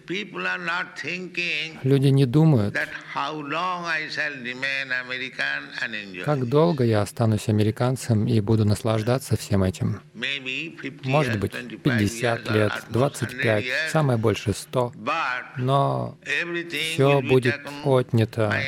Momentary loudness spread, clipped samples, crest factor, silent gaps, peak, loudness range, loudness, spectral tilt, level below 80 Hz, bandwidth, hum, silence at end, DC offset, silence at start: 9 LU; under 0.1%; 18 dB; none; -6 dBFS; 3 LU; -24 LUFS; -6 dB/octave; -56 dBFS; 15.5 kHz; none; 0 s; under 0.1%; 0.1 s